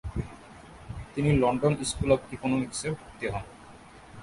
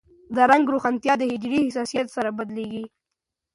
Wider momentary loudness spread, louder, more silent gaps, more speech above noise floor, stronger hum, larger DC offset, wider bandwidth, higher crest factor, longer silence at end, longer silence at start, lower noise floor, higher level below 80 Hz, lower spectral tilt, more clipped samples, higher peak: first, 24 LU vs 14 LU; second, -28 LUFS vs -23 LUFS; neither; second, 22 dB vs 62 dB; neither; neither; about the same, 11.5 kHz vs 11.5 kHz; about the same, 22 dB vs 20 dB; second, 0 s vs 0.7 s; second, 0.05 s vs 0.3 s; second, -49 dBFS vs -84 dBFS; first, -44 dBFS vs -64 dBFS; about the same, -6 dB/octave vs -5 dB/octave; neither; second, -8 dBFS vs -2 dBFS